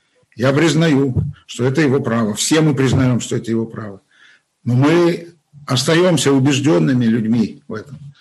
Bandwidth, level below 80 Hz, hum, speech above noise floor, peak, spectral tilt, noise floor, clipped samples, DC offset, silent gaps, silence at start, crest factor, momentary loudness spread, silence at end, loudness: 12.5 kHz; -48 dBFS; none; 36 dB; 0 dBFS; -5.5 dB/octave; -51 dBFS; under 0.1%; under 0.1%; none; 0.35 s; 16 dB; 15 LU; 0.1 s; -16 LUFS